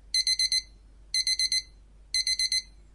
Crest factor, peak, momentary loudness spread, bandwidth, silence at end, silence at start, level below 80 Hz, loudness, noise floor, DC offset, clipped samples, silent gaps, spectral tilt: 16 dB; -12 dBFS; 6 LU; 11.5 kHz; 0.3 s; 0.15 s; -52 dBFS; -25 LUFS; -52 dBFS; under 0.1%; under 0.1%; none; 3.5 dB/octave